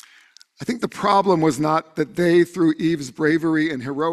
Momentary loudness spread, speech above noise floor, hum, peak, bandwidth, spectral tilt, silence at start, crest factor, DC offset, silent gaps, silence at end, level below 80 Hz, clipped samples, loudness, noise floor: 9 LU; 32 dB; none; -4 dBFS; 13.5 kHz; -6 dB/octave; 0.6 s; 16 dB; under 0.1%; none; 0 s; -60 dBFS; under 0.1%; -20 LUFS; -52 dBFS